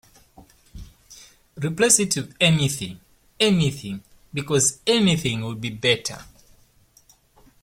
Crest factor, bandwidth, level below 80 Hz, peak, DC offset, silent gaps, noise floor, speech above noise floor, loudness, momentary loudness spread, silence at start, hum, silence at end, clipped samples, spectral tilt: 22 dB; 16.5 kHz; -52 dBFS; -2 dBFS; under 0.1%; none; -57 dBFS; 36 dB; -21 LUFS; 16 LU; 0.4 s; none; 1.4 s; under 0.1%; -3.5 dB/octave